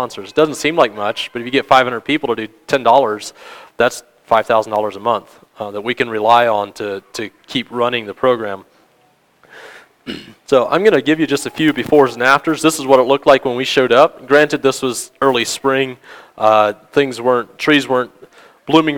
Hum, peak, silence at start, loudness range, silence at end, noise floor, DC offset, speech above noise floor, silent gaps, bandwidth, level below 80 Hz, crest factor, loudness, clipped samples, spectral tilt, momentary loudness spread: none; 0 dBFS; 0 s; 6 LU; 0 s; -55 dBFS; under 0.1%; 40 dB; none; 19 kHz; -54 dBFS; 16 dB; -15 LUFS; 0.1%; -4 dB/octave; 13 LU